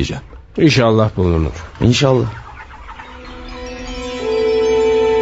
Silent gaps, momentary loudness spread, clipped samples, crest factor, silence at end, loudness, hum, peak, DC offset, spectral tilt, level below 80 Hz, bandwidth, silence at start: none; 21 LU; under 0.1%; 16 dB; 0 s; -15 LUFS; none; 0 dBFS; 0.2%; -6 dB/octave; -34 dBFS; 8 kHz; 0 s